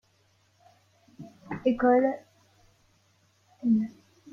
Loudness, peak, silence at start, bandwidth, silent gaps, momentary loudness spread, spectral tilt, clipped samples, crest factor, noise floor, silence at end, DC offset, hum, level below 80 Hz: -27 LUFS; -10 dBFS; 1.2 s; 6.8 kHz; none; 26 LU; -8 dB/octave; under 0.1%; 20 dB; -67 dBFS; 0.4 s; under 0.1%; none; -64 dBFS